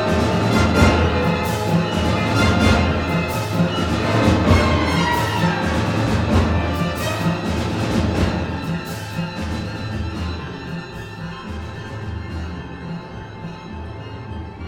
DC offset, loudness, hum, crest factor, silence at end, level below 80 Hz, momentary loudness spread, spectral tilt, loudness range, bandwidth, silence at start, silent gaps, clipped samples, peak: under 0.1%; -20 LUFS; none; 20 dB; 0 s; -30 dBFS; 16 LU; -6 dB/octave; 13 LU; 17.5 kHz; 0 s; none; under 0.1%; 0 dBFS